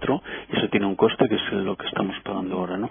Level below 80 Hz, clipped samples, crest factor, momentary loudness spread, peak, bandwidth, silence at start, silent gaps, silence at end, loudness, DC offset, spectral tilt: -54 dBFS; under 0.1%; 20 dB; 7 LU; -4 dBFS; 3.7 kHz; 0 s; none; 0 s; -24 LUFS; under 0.1%; -10 dB/octave